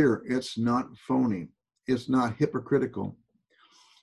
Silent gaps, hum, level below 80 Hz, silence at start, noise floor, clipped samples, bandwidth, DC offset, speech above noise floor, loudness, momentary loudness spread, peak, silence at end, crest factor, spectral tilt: none; none; -62 dBFS; 0 s; -65 dBFS; under 0.1%; 11.5 kHz; under 0.1%; 38 dB; -28 LUFS; 11 LU; -12 dBFS; 0.9 s; 18 dB; -7 dB/octave